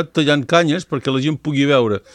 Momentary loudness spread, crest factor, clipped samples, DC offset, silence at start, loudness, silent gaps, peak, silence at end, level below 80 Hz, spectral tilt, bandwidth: 5 LU; 16 dB; under 0.1%; under 0.1%; 0 s; -17 LUFS; none; -2 dBFS; 0.15 s; -58 dBFS; -5.5 dB/octave; 10.5 kHz